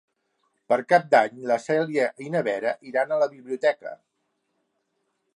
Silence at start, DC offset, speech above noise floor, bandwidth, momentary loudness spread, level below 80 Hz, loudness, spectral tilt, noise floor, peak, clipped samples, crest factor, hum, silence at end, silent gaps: 0.7 s; under 0.1%; 52 dB; 11 kHz; 7 LU; -80 dBFS; -24 LUFS; -5.5 dB/octave; -75 dBFS; -4 dBFS; under 0.1%; 20 dB; none; 1.4 s; none